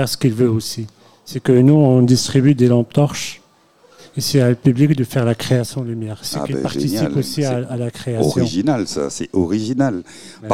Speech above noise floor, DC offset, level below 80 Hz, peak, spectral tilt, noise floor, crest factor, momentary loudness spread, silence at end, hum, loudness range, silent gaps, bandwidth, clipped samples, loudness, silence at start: 36 dB; 0.5%; -50 dBFS; -2 dBFS; -6.5 dB/octave; -52 dBFS; 16 dB; 13 LU; 0 s; none; 5 LU; none; 16 kHz; under 0.1%; -17 LUFS; 0 s